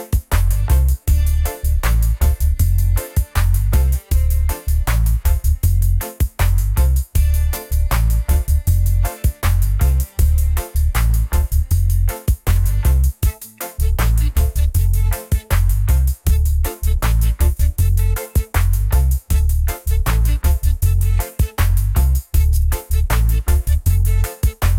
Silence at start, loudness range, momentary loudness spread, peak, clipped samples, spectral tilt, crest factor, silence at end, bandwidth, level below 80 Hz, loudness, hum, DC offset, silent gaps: 0 s; 1 LU; 3 LU; -4 dBFS; under 0.1%; -5.5 dB/octave; 12 dB; 0 s; 17 kHz; -16 dBFS; -18 LUFS; none; under 0.1%; none